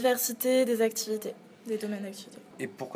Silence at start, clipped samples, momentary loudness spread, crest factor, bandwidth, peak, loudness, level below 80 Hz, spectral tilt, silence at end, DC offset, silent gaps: 0 s; under 0.1%; 17 LU; 16 dB; 16 kHz; -14 dBFS; -30 LUFS; -86 dBFS; -3 dB/octave; 0 s; under 0.1%; none